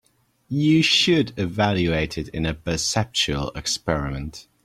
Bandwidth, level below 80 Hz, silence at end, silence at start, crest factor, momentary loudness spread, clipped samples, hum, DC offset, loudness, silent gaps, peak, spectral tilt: 15 kHz; -42 dBFS; 0.25 s; 0.5 s; 18 dB; 11 LU; under 0.1%; none; under 0.1%; -22 LUFS; none; -6 dBFS; -4 dB/octave